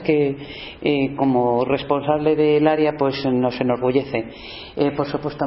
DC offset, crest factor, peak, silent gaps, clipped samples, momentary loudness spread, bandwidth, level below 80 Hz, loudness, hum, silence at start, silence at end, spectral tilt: under 0.1%; 16 dB; -4 dBFS; none; under 0.1%; 10 LU; 5.8 kHz; -50 dBFS; -20 LUFS; none; 0 s; 0 s; -11 dB/octave